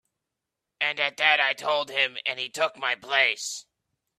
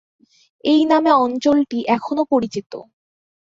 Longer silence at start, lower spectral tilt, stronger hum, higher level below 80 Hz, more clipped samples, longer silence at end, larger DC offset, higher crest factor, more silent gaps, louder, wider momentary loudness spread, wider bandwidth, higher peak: first, 0.8 s vs 0.65 s; second, 0 dB/octave vs -5.5 dB/octave; neither; second, -80 dBFS vs -62 dBFS; neither; about the same, 0.6 s vs 0.7 s; neither; first, 24 dB vs 16 dB; second, none vs 2.66-2.70 s; second, -24 LUFS vs -17 LUFS; second, 9 LU vs 14 LU; first, 14.5 kHz vs 7.6 kHz; about the same, -4 dBFS vs -2 dBFS